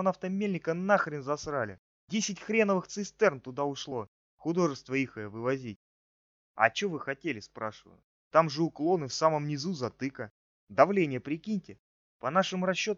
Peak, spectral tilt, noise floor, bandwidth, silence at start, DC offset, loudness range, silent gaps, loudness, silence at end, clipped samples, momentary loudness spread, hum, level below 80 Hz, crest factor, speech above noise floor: -6 dBFS; -4.5 dB/octave; under -90 dBFS; 7.8 kHz; 0 s; under 0.1%; 4 LU; 1.79-2.08 s, 4.08-4.38 s, 5.76-6.55 s, 8.04-8.31 s, 10.31-10.67 s, 11.79-12.20 s; -31 LUFS; 0 s; under 0.1%; 12 LU; none; -70 dBFS; 24 dB; over 60 dB